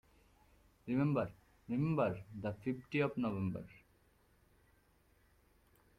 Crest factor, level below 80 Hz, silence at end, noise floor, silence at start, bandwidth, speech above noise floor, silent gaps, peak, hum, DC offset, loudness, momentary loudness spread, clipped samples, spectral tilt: 20 dB; -68 dBFS; 2.2 s; -71 dBFS; 0.85 s; 13.5 kHz; 34 dB; none; -22 dBFS; none; under 0.1%; -38 LUFS; 11 LU; under 0.1%; -9 dB/octave